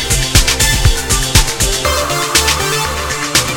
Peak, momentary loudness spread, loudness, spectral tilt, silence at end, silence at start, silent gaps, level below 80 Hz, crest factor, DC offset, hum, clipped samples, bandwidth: 0 dBFS; 4 LU; -12 LUFS; -2 dB/octave; 0 s; 0 s; none; -20 dBFS; 14 dB; 0.5%; none; 0.2%; 19 kHz